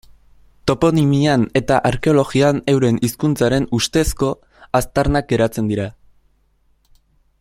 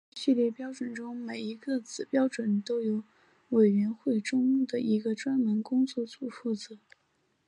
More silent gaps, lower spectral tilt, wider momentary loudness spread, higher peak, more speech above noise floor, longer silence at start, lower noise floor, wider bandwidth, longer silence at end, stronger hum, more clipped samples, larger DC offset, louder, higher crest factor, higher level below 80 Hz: neither; about the same, -6 dB/octave vs -6 dB/octave; second, 7 LU vs 12 LU; first, 0 dBFS vs -12 dBFS; about the same, 43 dB vs 44 dB; first, 0.65 s vs 0.15 s; second, -59 dBFS vs -73 dBFS; first, 16 kHz vs 10 kHz; first, 1.5 s vs 0.7 s; neither; neither; neither; first, -17 LUFS vs -30 LUFS; about the same, 18 dB vs 16 dB; first, -36 dBFS vs -82 dBFS